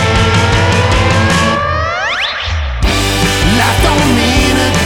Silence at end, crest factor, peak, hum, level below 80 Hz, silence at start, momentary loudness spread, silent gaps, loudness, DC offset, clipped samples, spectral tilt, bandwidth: 0 s; 10 dB; 0 dBFS; none; -20 dBFS; 0 s; 4 LU; none; -11 LUFS; 1%; under 0.1%; -4.5 dB/octave; 19.5 kHz